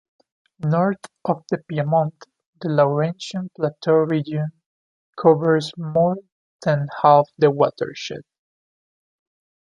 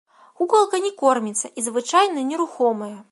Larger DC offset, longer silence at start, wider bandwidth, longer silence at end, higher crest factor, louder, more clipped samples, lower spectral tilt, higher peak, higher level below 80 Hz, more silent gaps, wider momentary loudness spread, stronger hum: neither; first, 0.6 s vs 0.4 s; about the same, 11 kHz vs 11.5 kHz; first, 1.45 s vs 0.1 s; about the same, 20 dB vs 16 dB; about the same, -21 LUFS vs -21 LUFS; neither; first, -7.5 dB/octave vs -2.5 dB/octave; about the same, -2 dBFS vs -4 dBFS; first, -66 dBFS vs -78 dBFS; first, 2.46-2.53 s, 4.66-5.13 s, 6.32-6.59 s vs none; first, 13 LU vs 7 LU; neither